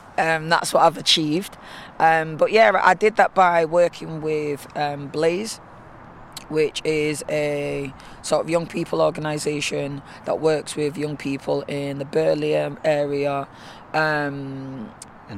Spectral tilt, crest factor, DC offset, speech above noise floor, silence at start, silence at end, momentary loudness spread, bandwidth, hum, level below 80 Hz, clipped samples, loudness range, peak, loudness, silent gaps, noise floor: -4 dB/octave; 20 dB; under 0.1%; 21 dB; 0 s; 0 s; 16 LU; 15 kHz; none; -56 dBFS; under 0.1%; 7 LU; -2 dBFS; -21 LUFS; none; -43 dBFS